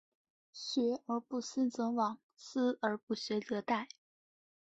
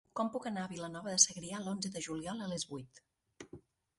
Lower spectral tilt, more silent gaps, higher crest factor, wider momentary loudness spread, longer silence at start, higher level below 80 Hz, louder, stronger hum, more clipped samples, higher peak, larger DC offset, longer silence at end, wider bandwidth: first, -4.5 dB/octave vs -2.5 dB/octave; first, 2.23-2.29 s, 3.03-3.07 s vs none; second, 20 dB vs 28 dB; second, 9 LU vs 20 LU; first, 0.55 s vs 0.15 s; second, -82 dBFS vs -72 dBFS; about the same, -36 LUFS vs -35 LUFS; neither; neither; second, -18 dBFS vs -10 dBFS; neither; first, 0.85 s vs 0.4 s; second, 8 kHz vs 11.5 kHz